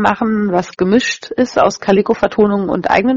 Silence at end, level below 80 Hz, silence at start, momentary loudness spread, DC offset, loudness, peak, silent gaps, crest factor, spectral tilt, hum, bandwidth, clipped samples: 0 s; -46 dBFS; 0 s; 4 LU; under 0.1%; -14 LUFS; 0 dBFS; none; 14 dB; -5.5 dB/octave; none; 7.6 kHz; under 0.1%